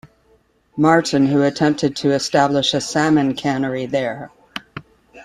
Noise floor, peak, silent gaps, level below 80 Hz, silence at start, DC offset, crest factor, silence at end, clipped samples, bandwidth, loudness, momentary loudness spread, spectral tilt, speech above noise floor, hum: -58 dBFS; -2 dBFS; none; -56 dBFS; 0.75 s; under 0.1%; 18 dB; 0 s; under 0.1%; 12 kHz; -17 LUFS; 18 LU; -5 dB/octave; 41 dB; none